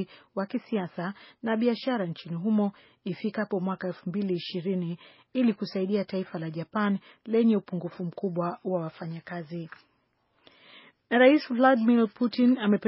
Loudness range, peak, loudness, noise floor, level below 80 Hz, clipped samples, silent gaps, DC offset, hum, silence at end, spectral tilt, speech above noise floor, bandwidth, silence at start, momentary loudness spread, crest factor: 5 LU; -8 dBFS; -28 LUFS; -71 dBFS; -78 dBFS; under 0.1%; none; under 0.1%; none; 0 s; -5.5 dB/octave; 44 dB; 5.8 kHz; 0 s; 15 LU; 20 dB